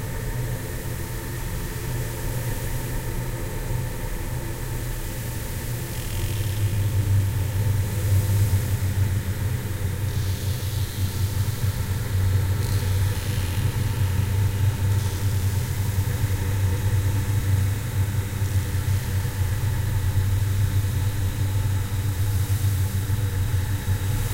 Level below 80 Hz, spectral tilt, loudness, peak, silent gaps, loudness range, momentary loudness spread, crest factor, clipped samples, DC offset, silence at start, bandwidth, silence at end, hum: -34 dBFS; -5.5 dB/octave; -25 LUFS; -10 dBFS; none; 6 LU; 7 LU; 14 dB; under 0.1%; under 0.1%; 0 s; 16 kHz; 0 s; none